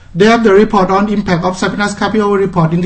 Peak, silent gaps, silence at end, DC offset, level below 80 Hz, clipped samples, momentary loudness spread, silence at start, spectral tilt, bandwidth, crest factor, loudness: 0 dBFS; none; 0 s; under 0.1%; -36 dBFS; 0.2%; 7 LU; 0.15 s; -6.5 dB/octave; 8.8 kHz; 10 dB; -11 LUFS